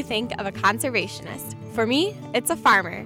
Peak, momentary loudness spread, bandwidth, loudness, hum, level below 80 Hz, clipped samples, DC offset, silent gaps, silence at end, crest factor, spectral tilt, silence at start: -8 dBFS; 14 LU; 17.5 kHz; -23 LUFS; none; -56 dBFS; under 0.1%; under 0.1%; none; 0 s; 16 dB; -3.5 dB/octave; 0 s